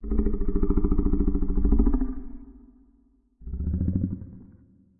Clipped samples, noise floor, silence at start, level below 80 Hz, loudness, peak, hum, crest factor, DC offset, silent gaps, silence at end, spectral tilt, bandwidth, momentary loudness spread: under 0.1%; -62 dBFS; 0 s; -28 dBFS; -27 LUFS; -10 dBFS; none; 16 dB; under 0.1%; none; 0.55 s; -15.5 dB/octave; 2.1 kHz; 20 LU